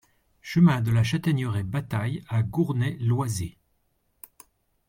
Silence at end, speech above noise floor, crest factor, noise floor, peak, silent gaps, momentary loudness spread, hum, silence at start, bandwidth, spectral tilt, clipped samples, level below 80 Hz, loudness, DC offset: 1.4 s; 47 dB; 18 dB; -71 dBFS; -8 dBFS; none; 9 LU; none; 0.45 s; 16.5 kHz; -7 dB/octave; under 0.1%; -56 dBFS; -25 LUFS; under 0.1%